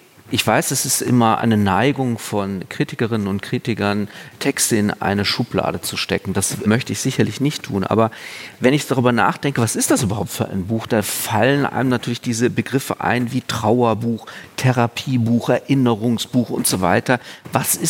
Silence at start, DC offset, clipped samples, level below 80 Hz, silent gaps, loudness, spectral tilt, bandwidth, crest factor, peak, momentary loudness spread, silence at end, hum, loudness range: 0.25 s; under 0.1%; under 0.1%; -60 dBFS; none; -19 LUFS; -4.5 dB/octave; 17 kHz; 18 dB; -2 dBFS; 7 LU; 0 s; none; 2 LU